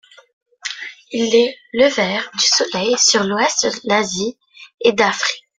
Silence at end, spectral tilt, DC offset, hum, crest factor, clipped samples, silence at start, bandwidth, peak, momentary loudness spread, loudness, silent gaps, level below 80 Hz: 0.2 s; -2 dB/octave; under 0.1%; none; 18 dB; under 0.1%; 0.65 s; 10.5 kHz; 0 dBFS; 13 LU; -16 LUFS; 4.74-4.78 s; -60 dBFS